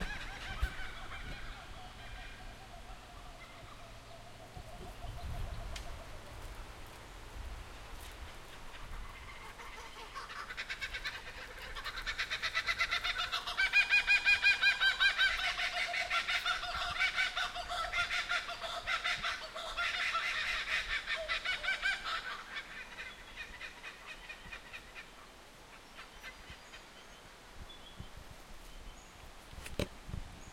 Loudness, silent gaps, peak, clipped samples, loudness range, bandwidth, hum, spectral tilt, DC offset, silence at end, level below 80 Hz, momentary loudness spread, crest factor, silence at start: -34 LUFS; none; -16 dBFS; under 0.1%; 22 LU; 16.5 kHz; none; -1.5 dB/octave; under 0.1%; 0 s; -50 dBFS; 24 LU; 22 dB; 0 s